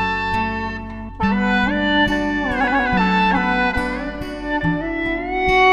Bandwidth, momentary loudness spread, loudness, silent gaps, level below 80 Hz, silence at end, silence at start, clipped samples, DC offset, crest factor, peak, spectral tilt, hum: 12 kHz; 10 LU; -19 LUFS; none; -34 dBFS; 0 s; 0 s; under 0.1%; under 0.1%; 16 dB; -4 dBFS; -6 dB/octave; none